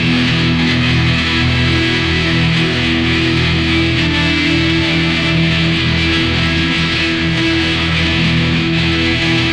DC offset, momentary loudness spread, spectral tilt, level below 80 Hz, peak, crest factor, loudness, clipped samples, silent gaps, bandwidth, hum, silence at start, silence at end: 0.1%; 1 LU; -5.5 dB/octave; -28 dBFS; -4 dBFS; 10 dB; -13 LUFS; under 0.1%; none; 10 kHz; none; 0 s; 0 s